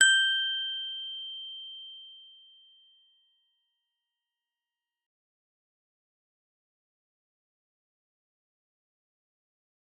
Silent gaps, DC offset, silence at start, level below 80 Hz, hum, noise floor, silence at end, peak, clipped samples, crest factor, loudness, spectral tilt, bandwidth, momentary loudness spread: none; under 0.1%; 0 s; under -90 dBFS; none; under -90 dBFS; 7.7 s; -8 dBFS; under 0.1%; 28 dB; -28 LUFS; 7 dB/octave; 9.6 kHz; 23 LU